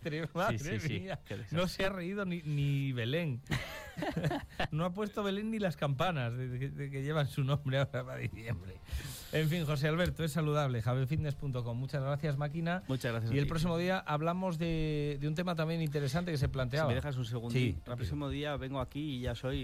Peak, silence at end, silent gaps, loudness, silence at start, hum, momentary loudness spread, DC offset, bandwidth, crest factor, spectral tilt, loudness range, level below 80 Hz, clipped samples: -18 dBFS; 0 s; none; -35 LUFS; 0 s; none; 6 LU; under 0.1%; 15.5 kHz; 16 dB; -6.5 dB/octave; 2 LU; -50 dBFS; under 0.1%